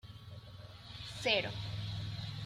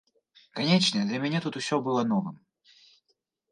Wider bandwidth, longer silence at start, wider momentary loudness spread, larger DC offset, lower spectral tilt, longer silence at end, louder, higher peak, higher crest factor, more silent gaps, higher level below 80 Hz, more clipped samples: first, 14 kHz vs 11 kHz; second, 0.05 s vs 0.55 s; first, 19 LU vs 8 LU; neither; about the same, -4.5 dB/octave vs -5 dB/octave; second, 0 s vs 1.15 s; second, -37 LUFS vs -27 LUFS; second, -16 dBFS vs -8 dBFS; about the same, 24 dB vs 22 dB; neither; first, -60 dBFS vs -74 dBFS; neither